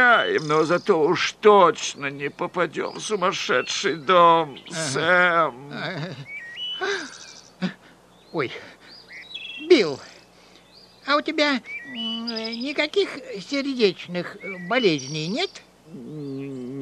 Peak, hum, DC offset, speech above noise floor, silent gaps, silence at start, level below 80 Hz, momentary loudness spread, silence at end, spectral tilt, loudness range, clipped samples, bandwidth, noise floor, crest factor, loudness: -2 dBFS; 60 Hz at -60 dBFS; under 0.1%; 30 dB; none; 0 s; -68 dBFS; 18 LU; 0 s; -4 dB/octave; 8 LU; under 0.1%; 11.5 kHz; -52 dBFS; 20 dB; -22 LUFS